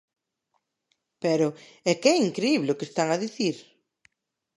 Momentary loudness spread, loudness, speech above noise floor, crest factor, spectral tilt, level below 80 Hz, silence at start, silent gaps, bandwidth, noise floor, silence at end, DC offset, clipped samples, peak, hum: 8 LU; -25 LUFS; 52 dB; 22 dB; -4.5 dB/octave; -80 dBFS; 1.2 s; none; 11.5 kHz; -76 dBFS; 1 s; under 0.1%; under 0.1%; -6 dBFS; none